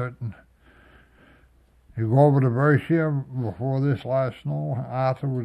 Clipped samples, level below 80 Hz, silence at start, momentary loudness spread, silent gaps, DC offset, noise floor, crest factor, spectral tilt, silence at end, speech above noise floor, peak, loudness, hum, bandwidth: under 0.1%; -58 dBFS; 0 s; 13 LU; none; under 0.1%; -57 dBFS; 18 dB; -10 dB/octave; 0 s; 35 dB; -6 dBFS; -23 LUFS; none; 5.4 kHz